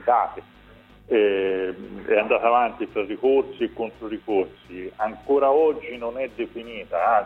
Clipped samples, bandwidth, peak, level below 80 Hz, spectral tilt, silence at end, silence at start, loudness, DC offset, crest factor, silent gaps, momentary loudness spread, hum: under 0.1%; 4.2 kHz; -6 dBFS; -56 dBFS; -7 dB/octave; 0 s; 0 s; -23 LUFS; under 0.1%; 18 dB; none; 13 LU; none